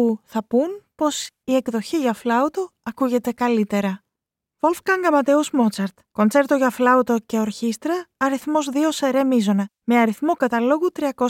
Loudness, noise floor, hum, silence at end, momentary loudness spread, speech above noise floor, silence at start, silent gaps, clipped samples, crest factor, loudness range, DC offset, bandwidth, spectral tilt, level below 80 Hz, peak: -21 LUFS; -85 dBFS; none; 0 s; 8 LU; 65 dB; 0 s; none; under 0.1%; 16 dB; 3 LU; under 0.1%; 17 kHz; -5 dB/octave; -66 dBFS; -4 dBFS